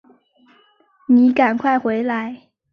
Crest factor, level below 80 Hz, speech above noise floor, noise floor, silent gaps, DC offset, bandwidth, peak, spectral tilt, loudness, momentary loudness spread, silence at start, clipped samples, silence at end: 16 dB; -64 dBFS; 40 dB; -56 dBFS; none; under 0.1%; 5.2 kHz; -4 dBFS; -7.5 dB/octave; -17 LUFS; 15 LU; 1.1 s; under 0.1%; 0.35 s